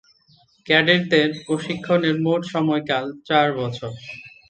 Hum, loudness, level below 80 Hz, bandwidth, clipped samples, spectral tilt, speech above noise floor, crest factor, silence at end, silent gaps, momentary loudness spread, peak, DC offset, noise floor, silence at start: none; -20 LUFS; -62 dBFS; 8.8 kHz; under 0.1%; -6 dB/octave; 37 dB; 22 dB; 0.2 s; none; 13 LU; 0 dBFS; under 0.1%; -57 dBFS; 0.65 s